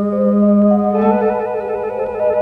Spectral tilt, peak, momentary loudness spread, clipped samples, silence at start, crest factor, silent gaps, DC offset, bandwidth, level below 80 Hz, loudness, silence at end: -11 dB/octave; -2 dBFS; 9 LU; under 0.1%; 0 s; 12 dB; none; under 0.1%; 3.6 kHz; -48 dBFS; -15 LUFS; 0 s